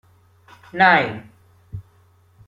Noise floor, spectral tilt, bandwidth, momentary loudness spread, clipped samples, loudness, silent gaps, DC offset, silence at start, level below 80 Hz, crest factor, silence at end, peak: -55 dBFS; -6.5 dB/octave; 7.4 kHz; 24 LU; under 0.1%; -16 LUFS; none; under 0.1%; 0.75 s; -56 dBFS; 22 dB; 0.65 s; -2 dBFS